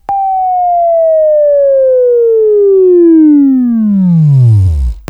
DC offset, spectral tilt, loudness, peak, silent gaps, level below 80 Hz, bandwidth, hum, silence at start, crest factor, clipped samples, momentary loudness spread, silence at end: under 0.1%; -12 dB/octave; -7 LUFS; 0 dBFS; none; -24 dBFS; 5.4 kHz; none; 0.1 s; 6 dB; under 0.1%; 5 LU; 0.1 s